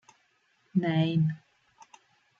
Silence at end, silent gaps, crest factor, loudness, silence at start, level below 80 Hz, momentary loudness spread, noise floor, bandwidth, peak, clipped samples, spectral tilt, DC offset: 1.05 s; none; 18 dB; -28 LUFS; 0.75 s; -72 dBFS; 7 LU; -70 dBFS; 6.8 kHz; -14 dBFS; under 0.1%; -8.5 dB/octave; under 0.1%